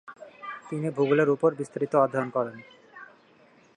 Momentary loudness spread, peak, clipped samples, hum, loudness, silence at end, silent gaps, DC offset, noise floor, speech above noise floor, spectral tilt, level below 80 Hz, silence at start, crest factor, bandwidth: 25 LU; -8 dBFS; under 0.1%; none; -26 LUFS; 0.7 s; none; under 0.1%; -58 dBFS; 33 dB; -7.5 dB/octave; -78 dBFS; 0.05 s; 18 dB; 10.5 kHz